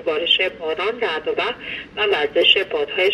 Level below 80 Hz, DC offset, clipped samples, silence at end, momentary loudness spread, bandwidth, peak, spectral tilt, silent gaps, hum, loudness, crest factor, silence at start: -56 dBFS; under 0.1%; under 0.1%; 0 s; 9 LU; 11.5 kHz; -2 dBFS; -3.5 dB/octave; none; none; -19 LUFS; 18 dB; 0 s